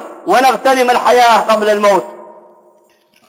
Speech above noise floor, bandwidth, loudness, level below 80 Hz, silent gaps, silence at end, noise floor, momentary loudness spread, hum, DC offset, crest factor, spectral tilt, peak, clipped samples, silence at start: 41 dB; 16.5 kHz; -11 LUFS; -60 dBFS; none; 1.05 s; -52 dBFS; 5 LU; none; under 0.1%; 12 dB; -3 dB/octave; -2 dBFS; under 0.1%; 0 s